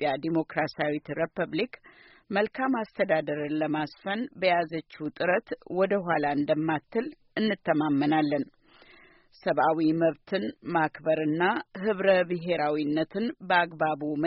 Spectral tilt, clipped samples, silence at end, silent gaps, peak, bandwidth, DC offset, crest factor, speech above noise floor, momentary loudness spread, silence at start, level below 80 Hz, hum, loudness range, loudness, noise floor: -4 dB/octave; under 0.1%; 0 s; none; -8 dBFS; 5.8 kHz; under 0.1%; 18 dB; 29 dB; 8 LU; 0 s; -68 dBFS; none; 3 LU; -28 LUFS; -56 dBFS